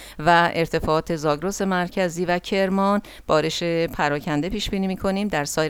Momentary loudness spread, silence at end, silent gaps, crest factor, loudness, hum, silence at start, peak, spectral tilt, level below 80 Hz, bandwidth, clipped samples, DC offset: 6 LU; 0 s; none; 18 dB; -22 LUFS; none; 0 s; -4 dBFS; -5 dB/octave; -42 dBFS; 17.5 kHz; under 0.1%; under 0.1%